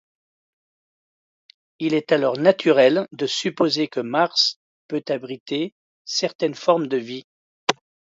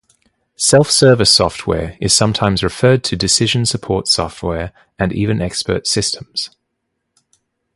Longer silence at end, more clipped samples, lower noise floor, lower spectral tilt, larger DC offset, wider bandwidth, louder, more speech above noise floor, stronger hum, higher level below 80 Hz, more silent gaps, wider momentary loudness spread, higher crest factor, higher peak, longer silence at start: second, 0.5 s vs 1.3 s; neither; first, under -90 dBFS vs -73 dBFS; about the same, -4 dB/octave vs -3.5 dB/octave; neither; second, 8 kHz vs 11.5 kHz; second, -21 LUFS vs -14 LUFS; first, over 69 dB vs 58 dB; neither; second, -74 dBFS vs -38 dBFS; first, 4.56-4.89 s, 5.40-5.46 s, 5.72-6.05 s, 6.35-6.39 s, 7.24-7.67 s vs none; about the same, 13 LU vs 12 LU; first, 22 dB vs 16 dB; about the same, -2 dBFS vs 0 dBFS; first, 1.8 s vs 0.6 s